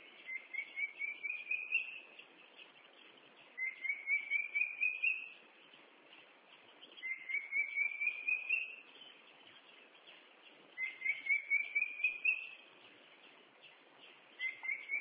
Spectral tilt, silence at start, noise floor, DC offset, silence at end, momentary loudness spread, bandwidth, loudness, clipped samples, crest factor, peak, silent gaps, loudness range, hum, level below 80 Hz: 3.5 dB/octave; 0 s; -62 dBFS; under 0.1%; 0 s; 24 LU; 4 kHz; -36 LUFS; under 0.1%; 20 dB; -22 dBFS; none; 4 LU; none; under -90 dBFS